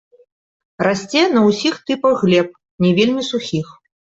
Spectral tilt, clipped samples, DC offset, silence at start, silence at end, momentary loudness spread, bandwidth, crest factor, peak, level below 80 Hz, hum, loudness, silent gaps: -5.5 dB/octave; under 0.1%; under 0.1%; 0.8 s; 0.45 s; 10 LU; 8 kHz; 14 dB; -2 dBFS; -58 dBFS; none; -17 LUFS; 2.71-2.78 s